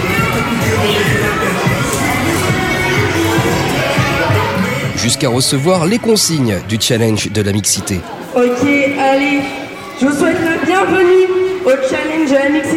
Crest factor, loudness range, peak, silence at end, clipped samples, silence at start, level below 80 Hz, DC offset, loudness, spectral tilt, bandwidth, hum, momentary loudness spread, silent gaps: 12 dB; 1 LU; 0 dBFS; 0 s; under 0.1%; 0 s; -38 dBFS; under 0.1%; -13 LUFS; -4.5 dB/octave; 16.5 kHz; none; 4 LU; none